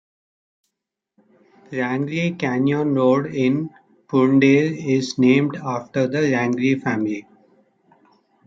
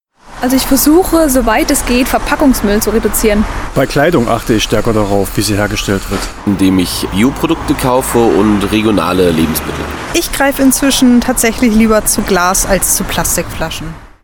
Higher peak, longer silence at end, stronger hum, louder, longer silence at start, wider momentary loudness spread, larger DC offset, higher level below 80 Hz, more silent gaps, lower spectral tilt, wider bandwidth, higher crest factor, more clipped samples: second, -4 dBFS vs 0 dBFS; first, 1.25 s vs 0.15 s; neither; second, -20 LUFS vs -11 LUFS; first, 1.7 s vs 0.25 s; first, 10 LU vs 7 LU; neither; second, -64 dBFS vs -24 dBFS; neither; first, -7 dB/octave vs -4 dB/octave; second, 7.6 kHz vs 19 kHz; first, 18 dB vs 12 dB; neither